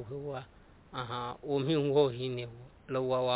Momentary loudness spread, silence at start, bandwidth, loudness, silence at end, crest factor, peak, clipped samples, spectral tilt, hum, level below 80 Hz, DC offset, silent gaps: 16 LU; 0 s; 4 kHz; -33 LUFS; 0 s; 18 dB; -14 dBFS; under 0.1%; -5.5 dB/octave; none; -62 dBFS; under 0.1%; none